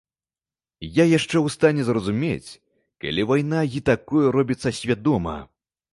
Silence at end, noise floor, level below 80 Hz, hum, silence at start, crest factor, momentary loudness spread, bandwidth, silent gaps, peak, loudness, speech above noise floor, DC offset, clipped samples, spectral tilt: 0.5 s; under -90 dBFS; -48 dBFS; none; 0.8 s; 20 dB; 11 LU; 11.5 kHz; none; -4 dBFS; -22 LUFS; over 69 dB; under 0.1%; under 0.1%; -6 dB/octave